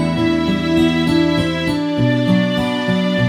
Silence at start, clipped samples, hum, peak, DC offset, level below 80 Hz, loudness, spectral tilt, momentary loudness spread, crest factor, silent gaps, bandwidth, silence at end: 0 s; under 0.1%; none; -2 dBFS; under 0.1%; -40 dBFS; -16 LUFS; -6.5 dB/octave; 3 LU; 12 dB; none; 19.5 kHz; 0 s